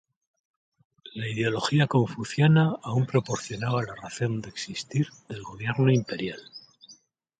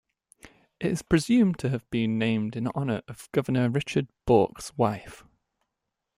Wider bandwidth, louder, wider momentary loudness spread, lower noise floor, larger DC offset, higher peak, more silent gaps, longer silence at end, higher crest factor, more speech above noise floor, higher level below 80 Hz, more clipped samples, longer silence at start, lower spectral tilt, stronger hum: second, 9.2 kHz vs 15.5 kHz; about the same, -26 LUFS vs -26 LUFS; first, 14 LU vs 8 LU; second, -56 dBFS vs -84 dBFS; neither; about the same, -8 dBFS vs -8 dBFS; neither; second, 0.45 s vs 1 s; about the same, 18 dB vs 20 dB; second, 31 dB vs 58 dB; second, -62 dBFS vs -54 dBFS; neither; first, 1.05 s vs 0.45 s; about the same, -6 dB/octave vs -6.5 dB/octave; neither